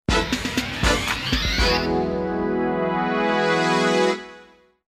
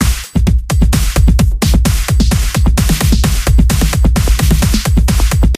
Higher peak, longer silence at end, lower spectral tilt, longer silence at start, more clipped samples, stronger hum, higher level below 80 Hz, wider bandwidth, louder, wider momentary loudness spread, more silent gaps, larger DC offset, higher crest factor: second, -6 dBFS vs 0 dBFS; first, 0.45 s vs 0 s; about the same, -4.5 dB/octave vs -5 dB/octave; about the same, 0.1 s vs 0 s; neither; neither; second, -32 dBFS vs -12 dBFS; about the same, 15.5 kHz vs 16 kHz; second, -21 LUFS vs -12 LUFS; first, 5 LU vs 2 LU; neither; neither; first, 16 dB vs 10 dB